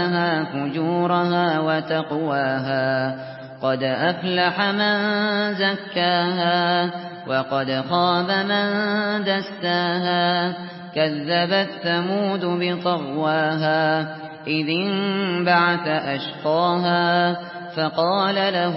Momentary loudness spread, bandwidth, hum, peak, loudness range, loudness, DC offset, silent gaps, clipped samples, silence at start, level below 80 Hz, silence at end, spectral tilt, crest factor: 6 LU; 5.8 kHz; none; -6 dBFS; 2 LU; -21 LUFS; under 0.1%; none; under 0.1%; 0 s; -68 dBFS; 0 s; -10 dB/octave; 16 dB